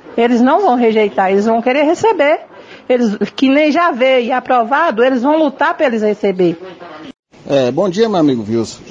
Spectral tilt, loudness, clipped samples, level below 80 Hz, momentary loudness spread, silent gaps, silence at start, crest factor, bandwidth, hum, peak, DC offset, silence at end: -6 dB/octave; -13 LUFS; under 0.1%; -58 dBFS; 6 LU; 7.19-7.23 s; 0.05 s; 12 dB; 9.2 kHz; none; 0 dBFS; under 0.1%; 0 s